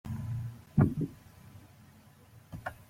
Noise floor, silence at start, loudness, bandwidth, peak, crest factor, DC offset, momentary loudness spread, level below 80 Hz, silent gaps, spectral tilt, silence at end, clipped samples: -58 dBFS; 0.05 s; -33 LUFS; 16 kHz; -10 dBFS; 24 dB; under 0.1%; 26 LU; -54 dBFS; none; -9 dB/octave; 0.05 s; under 0.1%